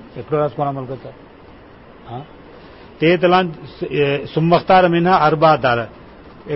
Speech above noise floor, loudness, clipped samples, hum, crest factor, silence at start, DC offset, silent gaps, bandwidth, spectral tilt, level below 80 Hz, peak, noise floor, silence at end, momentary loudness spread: 26 dB; -16 LUFS; under 0.1%; none; 16 dB; 0 s; under 0.1%; none; 5.8 kHz; -10.5 dB/octave; -48 dBFS; -2 dBFS; -42 dBFS; 0 s; 19 LU